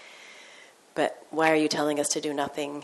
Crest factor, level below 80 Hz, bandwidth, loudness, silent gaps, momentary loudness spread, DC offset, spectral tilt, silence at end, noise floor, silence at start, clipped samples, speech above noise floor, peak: 20 dB; -74 dBFS; 12 kHz; -26 LUFS; none; 23 LU; under 0.1%; -3 dB/octave; 0 s; -52 dBFS; 0 s; under 0.1%; 26 dB; -8 dBFS